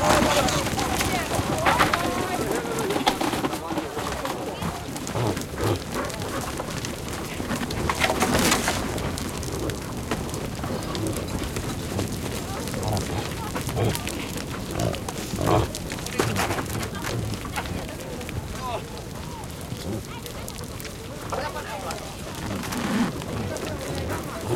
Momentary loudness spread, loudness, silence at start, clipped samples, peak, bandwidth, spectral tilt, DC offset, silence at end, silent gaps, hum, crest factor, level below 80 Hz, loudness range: 11 LU; -27 LUFS; 0 s; under 0.1%; -6 dBFS; 17 kHz; -4 dB/octave; under 0.1%; 0 s; none; none; 22 dB; -40 dBFS; 8 LU